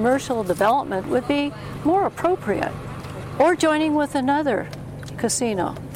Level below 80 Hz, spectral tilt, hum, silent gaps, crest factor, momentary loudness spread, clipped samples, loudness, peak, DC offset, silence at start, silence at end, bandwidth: -48 dBFS; -5 dB/octave; none; none; 12 dB; 14 LU; under 0.1%; -22 LUFS; -8 dBFS; under 0.1%; 0 s; 0 s; 16.5 kHz